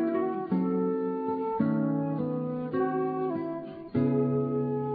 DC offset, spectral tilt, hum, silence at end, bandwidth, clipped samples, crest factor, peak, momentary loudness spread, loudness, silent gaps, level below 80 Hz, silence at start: under 0.1%; -12.5 dB/octave; none; 0 s; 4.8 kHz; under 0.1%; 14 dB; -14 dBFS; 5 LU; -29 LUFS; none; -66 dBFS; 0 s